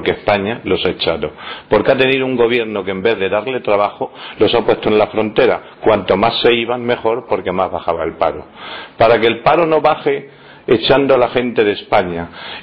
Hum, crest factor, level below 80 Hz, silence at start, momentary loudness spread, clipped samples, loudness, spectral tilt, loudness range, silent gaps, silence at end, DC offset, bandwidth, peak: none; 14 dB; -44 dBFS; 0 s; 11 LU; under 0.1%; -15 LUFS; -8 dB/octave; 2 LU; none; 0 s; under 0.1%; 5.6 kHz; -2 dBFS